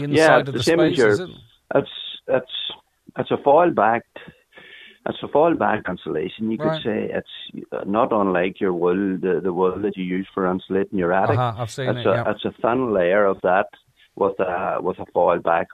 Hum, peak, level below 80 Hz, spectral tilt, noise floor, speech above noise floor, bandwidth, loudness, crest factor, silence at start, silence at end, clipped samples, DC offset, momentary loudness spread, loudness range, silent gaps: none; -2 dBFS; -56 dBFS; -6 dB/octave; -46 dBFS; 26 dB; 13.5 kHz; -21 LUFS; 20 dB; 0 s; 0.1 s; under 0.1%; under 0.1%; 13 LU; 3 LU; none